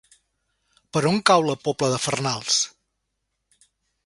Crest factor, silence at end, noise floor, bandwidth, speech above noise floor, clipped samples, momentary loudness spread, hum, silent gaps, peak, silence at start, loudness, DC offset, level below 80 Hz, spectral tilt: 22 dB; 1.4 s; -77 dBFS; 11.5 kHz; 56 dB; under 0.1%; 7 LU; none; none; -2 dBFS; 0.95 s; -22 LUFS; under 0.1%; -62 dBFS; -3.5 dB/octave